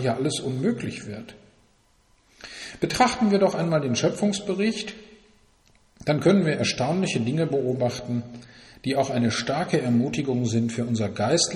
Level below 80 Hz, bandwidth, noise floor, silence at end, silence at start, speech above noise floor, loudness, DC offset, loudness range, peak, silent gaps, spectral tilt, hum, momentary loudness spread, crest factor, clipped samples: -56 dBFS; 12.5 kHz; -62 dBFS; 0 s; 0 s; 38 dB; -24 LUFS; under 0.1%; 2 LU; -6 dBFS; none; -5 dB/octave; none; 16 LU; 18 dB; under 0.1%